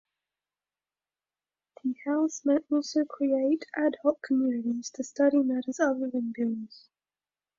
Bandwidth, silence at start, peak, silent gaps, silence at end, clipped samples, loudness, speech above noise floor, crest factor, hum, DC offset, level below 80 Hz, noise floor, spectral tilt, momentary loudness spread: 7.6 kHz; 1.85 s; -12 dBFS; none; 0.8 s; under 0.1%; -28 LUFS; over 62 dB; 18 dB; none; under 0.1%; -78 dBFS; under -90 dBFS; -4.5 dB/octave; 9 LU